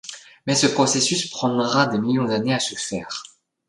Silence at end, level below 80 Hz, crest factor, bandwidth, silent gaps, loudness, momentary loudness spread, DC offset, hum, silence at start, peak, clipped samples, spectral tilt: 0.45 s; -62 dBFS; 18 dB; 11.5 kHz; none; -21 LUFS; 14 LU; under 0.1%; none; 0.05 s; -4 dBFS; under 0.1%; -3.5 dB/octave